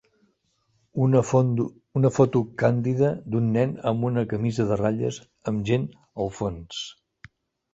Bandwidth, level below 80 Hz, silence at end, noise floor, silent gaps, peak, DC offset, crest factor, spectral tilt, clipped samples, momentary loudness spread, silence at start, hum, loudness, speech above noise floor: 8 kHz; -54 dBFS; 0.8 s; -70 dBFS; none; -4 dBFS; under 0.1%; 20 dB; -7.5 dB/octave; under 0.1%; 13 LU; 0.95 s; none; -25 LUFS; 46 dB